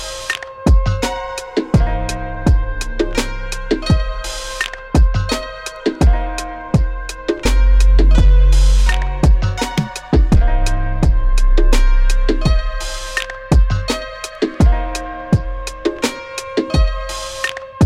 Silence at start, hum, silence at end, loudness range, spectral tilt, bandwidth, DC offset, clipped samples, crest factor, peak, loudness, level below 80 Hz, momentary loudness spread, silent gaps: 0 s; none; 0 s; 4 LU; -5.5 dB/octave; 12.5 kHz; under 0.1%; under 0.1%; 10 dB; -4 dBFS; -18 LUFS; -16 dBFS; 11 LU; none